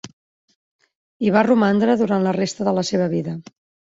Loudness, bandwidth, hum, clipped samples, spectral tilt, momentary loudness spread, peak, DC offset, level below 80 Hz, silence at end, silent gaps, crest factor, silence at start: -19 LUFS; 7.8 kHz; none; under 0.1%; -6 dB/octave; 9 LU; -2 dBFS; under 0.1%; -62 dBFS; 0.55 s; 0.13-0.48 s, 0.55-0.79 s, 0.95-1.20 s; 18 dB; 0.05 s